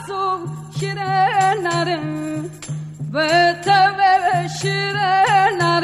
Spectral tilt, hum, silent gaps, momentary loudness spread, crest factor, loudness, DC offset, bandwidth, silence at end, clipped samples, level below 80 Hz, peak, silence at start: -4.5 dB/octave; 50 Hz at -50 dBFS; none; 13 LU; 14 dB; -17 LUFS; under 0.1%; 13 kHz; 0 s; under 0.1%; -56 dBFS; -4 dBFS; 0 s